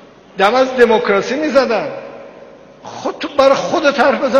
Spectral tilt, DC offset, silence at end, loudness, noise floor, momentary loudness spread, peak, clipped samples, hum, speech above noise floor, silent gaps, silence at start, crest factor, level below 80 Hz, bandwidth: -4 dB/octave; under 0.1%; 0 s; -14 LUFS; -39 dBFS; 20 LU; 0 dBFS; under 0.1%; none; 26 dB; none; 0.35 s; 14 dB; -52 dBFS; 9.4 kHz